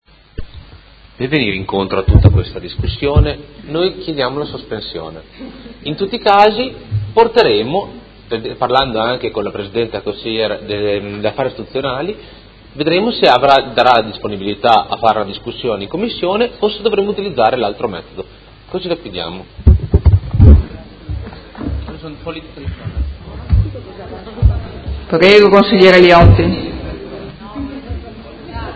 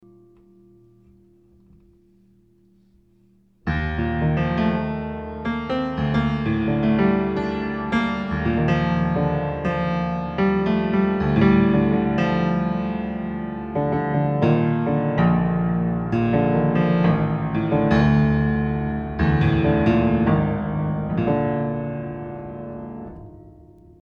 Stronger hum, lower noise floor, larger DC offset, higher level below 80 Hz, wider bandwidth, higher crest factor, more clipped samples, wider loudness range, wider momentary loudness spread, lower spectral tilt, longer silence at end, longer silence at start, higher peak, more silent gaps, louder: neither; second, -40 dBFS vs -58 dBFS; neither; first, -22 dBFS vs -38 dBFS; first, 8 kHz vs 6.4 kHz; about the same, 14 dB vs 18 dB; first, 0.4% vs under 0.1%; first, 10 LU vs 6 LU; first, 20 LU vs 10 LU; second, -7.5 dB/octave vs -9.5 dB/octave; second, 0 s vs 0.5 s; second, 0.4 s vs 3.65 s; first, 0 dBFS vs -4 dBFS; neither; first, -14 LUFS vs -21 LUFS